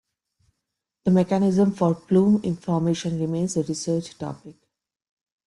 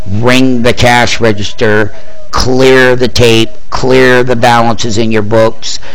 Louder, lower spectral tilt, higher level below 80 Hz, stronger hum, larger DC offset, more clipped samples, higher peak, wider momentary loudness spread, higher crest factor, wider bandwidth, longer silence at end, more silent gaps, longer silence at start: second, -22 LUFS vs -8 LUFS; first, -7 dB/octave vs -5 dB/octave; second, -60 dBFS vs -28 dBFS; neither; second, under 0.1% vs 30%; second, under 0.1% vs 4%; second, -6 dBFS vs 0 dBFS; first, 11 LU vs 8 LU; first, 18 dB vs 10 dB; second, 11.5 kHz vs 17.5 kHz; first, 0.95 s vs 0 s; neither; first, 1.05 s vs 0 s